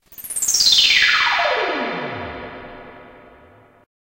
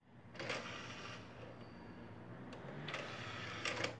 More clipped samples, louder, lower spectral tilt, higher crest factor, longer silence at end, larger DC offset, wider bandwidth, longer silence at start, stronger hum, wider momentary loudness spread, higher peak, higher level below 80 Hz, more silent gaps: neither; first, -15 LUFS vs -47 LUFS; second, 0.5 dB/octave vs -4 dB/octave; second, 18 dB vs 24 dB; first, 1.1 s vs 0 s; neither; first, 16 kHz vs 11 kHz; about the same, 0.1 s vs 0 s; neither; first, 23 LU vs 12 LU; first, -2 dBFS vs -22 dBFS; first, -52 dBFS vs -72 dBFS; neither